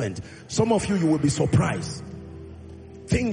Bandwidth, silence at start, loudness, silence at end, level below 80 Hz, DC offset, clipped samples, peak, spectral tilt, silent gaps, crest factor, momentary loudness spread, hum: 10 kHz; 0 s; -24 LUFS; 0 s; -46 dBFS; under 0.1%; under 0.1%; -8 dBFS; -6 dB/octave; none; 16 dB; 20 LU; none